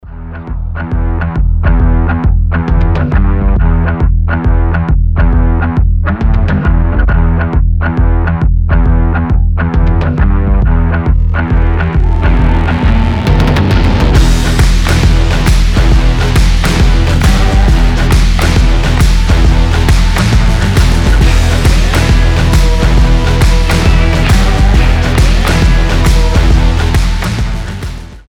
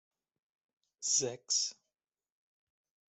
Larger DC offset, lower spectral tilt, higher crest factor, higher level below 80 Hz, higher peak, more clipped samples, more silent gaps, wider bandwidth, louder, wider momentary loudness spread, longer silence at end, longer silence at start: neither; first, -6 dB/octave vs -0.5 dB/octave; second, 8 dB vs 22 dB; first, -10 dBFS vs -86 dBFS; first, 0 dBFS vs -18 dBFS; neither; neither; first, 13 kHz vs 8.2 kHz; first, -11 LUFS vs -32 LUFS; second, 3 LU vs 7 LU; second, 0.1 s vs 1.35 s; second, 0.05 s vs 1 s